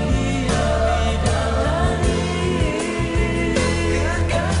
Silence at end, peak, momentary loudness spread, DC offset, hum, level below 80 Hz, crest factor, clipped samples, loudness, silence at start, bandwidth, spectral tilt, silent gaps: 0 s; -6 dBFS; 2 LU; under 0.1%; none; -26 dBFS; 12 dB; under 0.1%; -20 LUFS; 0 s; 11 kHz; -5.5 dB/octave; none